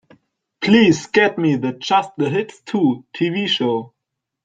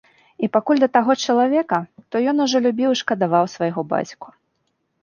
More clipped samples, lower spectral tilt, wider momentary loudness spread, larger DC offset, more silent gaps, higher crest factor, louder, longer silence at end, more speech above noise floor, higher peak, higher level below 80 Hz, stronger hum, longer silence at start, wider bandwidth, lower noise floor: neither; about the same, -5.5 dB/octave vs -5 dB/octave; about the same, 10 LU vs 8 LU; neither; neither; about the same, 18 dB vs 18 dB; about the same, -18 LUFS vs -19 LUFS; second, 0.55 s vs 0.75 s; first, 63 dB vs 52 dB; about the same, -2 dBFS vs -2 dBFS; first, -60 dBFS vs -70 dBFS; neither; first, 0.6 s vs 0.4 s; first, 9 kHz vs 7.2 kHz; first, -80 dBFS vs -71 dBFS